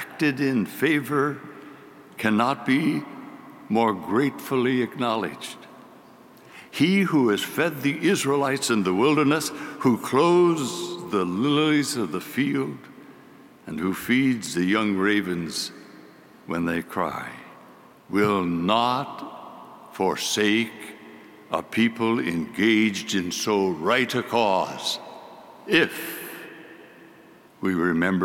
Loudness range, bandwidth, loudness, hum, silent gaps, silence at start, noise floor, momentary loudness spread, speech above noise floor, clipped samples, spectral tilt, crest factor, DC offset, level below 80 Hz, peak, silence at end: 5 LU; 17 kHz; -23 LUFS; none; none; 0 s; -51 dBFS; 17 LU; 28 dB; under 0.1%; -4.5 dB/octave; 18 dB; under 0.1%; -66 dBFS; -6 dBFS; 0 s